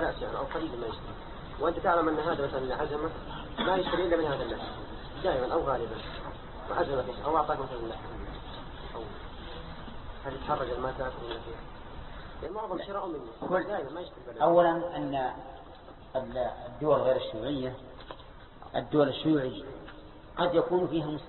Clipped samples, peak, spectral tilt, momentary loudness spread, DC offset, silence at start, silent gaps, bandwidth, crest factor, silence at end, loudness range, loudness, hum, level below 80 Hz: under 0.1%; -10 dBFS; -10 dB/octave; 18 LU; under 0.1%; 0 s; none; 4.3 kHz; 20 dB; 0 s; 7 LU; -31 LUFS; none; -48 dBFS